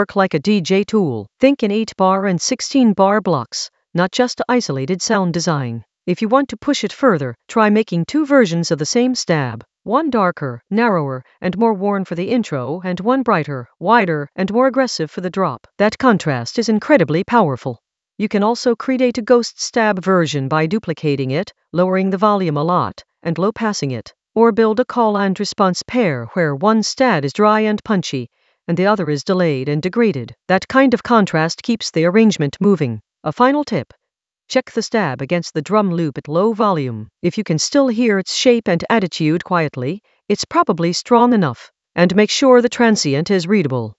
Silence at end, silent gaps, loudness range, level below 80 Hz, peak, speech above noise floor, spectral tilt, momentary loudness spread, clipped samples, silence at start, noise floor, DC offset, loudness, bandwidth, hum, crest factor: 0.05 s; none; 3 LU; -58 dBFS; 0 dBFS; 59 dB; -5.5 dB/octave; 9 LU; under 0.1%; 0 s; -75 dBFS; under 0.1%; -17 LUFS; 8.2 kHz; none; 16 dB